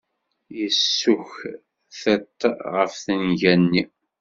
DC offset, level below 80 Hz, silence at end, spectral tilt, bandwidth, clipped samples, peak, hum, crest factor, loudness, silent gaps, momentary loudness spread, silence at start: under 0.1%; -60 dBFS; 0.35 s; -3.5 dB/octave; 7.6 kHz; under 0.1%; -2 dBFS; none; 20 dB; -21 LUFS; none; 17 LU; 0.5 s